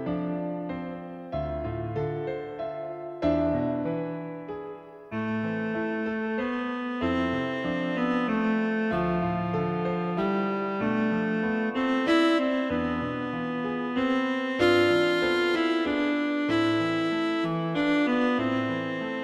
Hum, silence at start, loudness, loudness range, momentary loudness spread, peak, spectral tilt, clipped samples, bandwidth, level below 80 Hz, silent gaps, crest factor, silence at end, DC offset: none; 0 s; -27 LUFS; 6 LU; 10 LU; -12 dBFS; -7 dB/octave; under 0.1%; 11.5 kHz; -52 dBFS; none; 16 dB; 0 s; under 0.1%